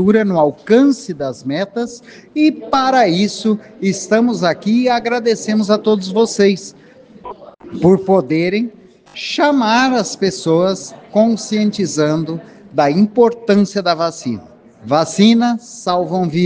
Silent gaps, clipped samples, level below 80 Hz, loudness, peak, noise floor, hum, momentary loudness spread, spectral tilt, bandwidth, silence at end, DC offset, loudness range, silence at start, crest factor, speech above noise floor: none; under 0.1%; -56 dBFS; -15 LUFS; 0 dBFS; -34 dBFS; none; 13 LU; -5.5 dB/octave; 9.8 kHz; 0 s; under 0.1%; 2 LU; 0 s; 14 dB; 20 dB